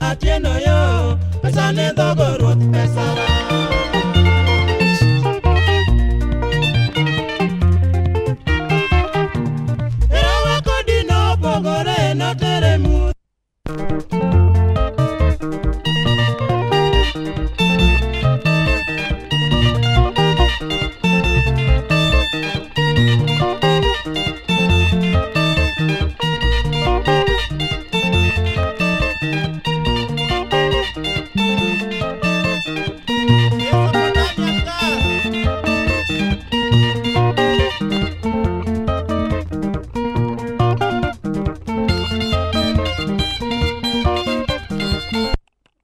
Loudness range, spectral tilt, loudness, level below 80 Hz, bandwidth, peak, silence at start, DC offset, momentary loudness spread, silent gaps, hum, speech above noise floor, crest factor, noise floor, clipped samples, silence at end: 4 LU; -6 dB/octave; -17 LUFS; -24 dBFS; 13 kHz; 0 dBFS; 0 s; under 0.1%; 7 LU; none; none; 45 dB; 16 dB; -60 dBFS; under 0.1%; 0.45 s